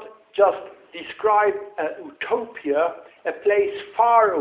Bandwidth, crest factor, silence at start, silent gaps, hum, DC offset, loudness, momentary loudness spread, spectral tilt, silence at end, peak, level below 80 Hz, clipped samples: 4 kHz; 18 dB; 0 s; none; none; under 0.1%; -22 LUFS; 14 LU; -7.5 dB/octave; 0 s; -4 dBFS; -66 dBFS; under 0.1%